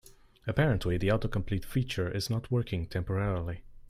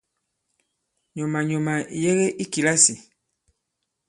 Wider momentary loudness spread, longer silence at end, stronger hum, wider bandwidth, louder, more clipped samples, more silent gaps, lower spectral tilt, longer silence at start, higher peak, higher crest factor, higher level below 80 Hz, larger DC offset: second, 6 LU vs 14 LU; second, 0.1 s vs 1.1 s; neither; first, 15.5 kHz vs 11.5 kHz; second, -31 LUFS vs -21 LUFS; neither; neither; first, -6.5 dB/octave vs -3.5 dB/octave; second, 0.05 s vs 1.15 s; second, -12 dBFS vs -2 dBFS; about the same, 20 dB vs 24 dB; first, -44 dBFS vs -66 dBFS; neither